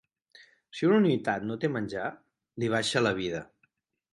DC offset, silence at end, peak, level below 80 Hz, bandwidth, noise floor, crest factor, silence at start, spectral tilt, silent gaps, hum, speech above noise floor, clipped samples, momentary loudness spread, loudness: under 0.1%; 0.7 s; -12 dBFS; -64 dBFS; 11.5 kHz; -73 dBFS; 18 dB; 0.75 s; -5.5 dB/octave; none; none; 45 dB; under 0.1%; 14 LU; -28 LUFS